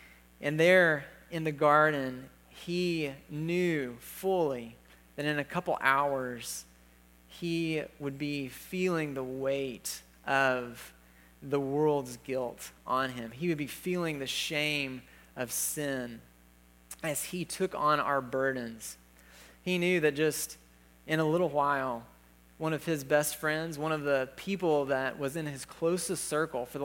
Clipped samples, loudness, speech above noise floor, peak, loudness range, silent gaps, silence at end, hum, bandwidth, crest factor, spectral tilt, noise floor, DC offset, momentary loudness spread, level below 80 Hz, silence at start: under 0.1%; -31 LUFS; 29 dB; -8 dBFS; 4 LU; none; 0 s; 60 Hz at -60 dBFS; 17 kHz; 24 dB; -4.5 dB/octave; -60 dBFS; under 0.1%; 14 LU; -64 dBFS; 0 s